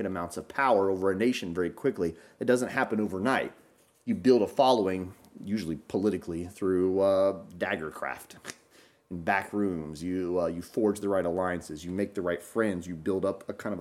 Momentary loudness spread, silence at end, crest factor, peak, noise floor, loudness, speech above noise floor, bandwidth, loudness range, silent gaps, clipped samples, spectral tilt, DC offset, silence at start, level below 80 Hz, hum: 12 LU; 0 s; 18 dB; -10 dBFS; -60 dBFS; -29 LUFS; 32 dB; 15.5 kHz; 4 LU; none; under 0.1%; -6 dB/octave; under 0.1%; 0 s; -62 dBFS; none